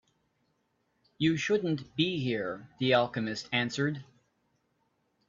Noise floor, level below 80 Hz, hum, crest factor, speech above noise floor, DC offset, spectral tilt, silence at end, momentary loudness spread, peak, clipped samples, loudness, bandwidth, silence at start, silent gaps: -76 dBFS; -70 dBFS; none; 22 dB; 46 dB; under 0.1%; -5.5 dB/octave; 1.25 s; 7 LU; -12 dBFS; under 0.1%; -30 LUFS; 7.6 kHz; 1.2 s; none